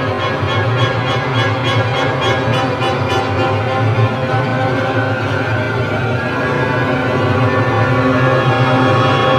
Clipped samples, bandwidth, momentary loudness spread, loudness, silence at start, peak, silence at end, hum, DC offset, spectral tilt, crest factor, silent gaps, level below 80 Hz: under 0.1%; 10 kHz; 4 LU; -15 LUFS; 0 s; 0 dBFS; 0 s; none; under 0.1%; -6.5 dB/octave; 14 dB; none; -42 dBFS